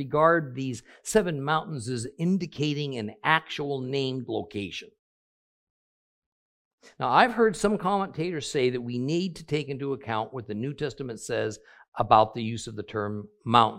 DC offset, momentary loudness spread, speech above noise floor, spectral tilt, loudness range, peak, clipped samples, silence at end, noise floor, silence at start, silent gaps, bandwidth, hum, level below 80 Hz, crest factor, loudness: under 0.1%; 12 LU; over 63 dB; -5 dB/octave; 5 LU; -2 dBFS; under 0.1%; 0 s; under -90 dBFS; 0 s; 4.99-6.78 s, 11.88-11.92 s; 15.5 kHz; none; -58 dBFS; 24 dB; -27 LUFS